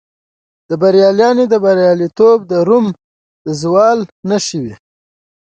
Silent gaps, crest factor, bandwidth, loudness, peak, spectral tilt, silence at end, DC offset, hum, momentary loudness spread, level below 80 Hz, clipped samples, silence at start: 3.04-3.45 s, 4.12-4.23 s; 12 dB; 9 kHz; -12 LUFS; 0 dBFS; -5.5 dB/octave; 0.7 s; under 0.1%; none; 14 LU; -56 dBFS; under 0.1%; 0.7 s